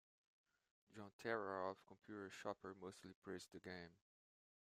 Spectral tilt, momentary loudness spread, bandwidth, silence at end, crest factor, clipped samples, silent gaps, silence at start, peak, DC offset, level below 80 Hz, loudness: -5 dB/octave; 14 LU; 14.5 kHz; 0.8 s; 24 dB; under 0.1%; 1.13-1.19 s, 3.15-3.22 s; 0.9 s; -30 dBFS; under 0.1%; -90 dBFS; -52 LUFS